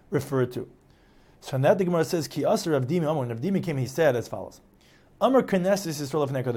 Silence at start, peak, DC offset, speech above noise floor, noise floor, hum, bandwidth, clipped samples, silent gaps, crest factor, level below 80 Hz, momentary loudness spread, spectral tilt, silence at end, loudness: 0.1 s; -8 dBFS; under 0.1%; 32 dB; -57 dBFS; none; 17.5 kHz; under 0.1%; none; 18 dB; -60 dBFS; 13 LU; -6 dB/octave; 0 s; -25 LUFS